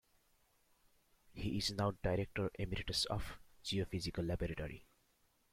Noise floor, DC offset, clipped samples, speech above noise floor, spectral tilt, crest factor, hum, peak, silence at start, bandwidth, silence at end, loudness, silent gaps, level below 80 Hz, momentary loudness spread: -76 dBFS; under 0.1%; under 0.1%; 36 dB; -5 dB/octave; 18 dB; none; -24 dBFS; 1.3 s; 16 kHz; 0.7 s; -40 LUFS; none; -54 dBFS; 11 LU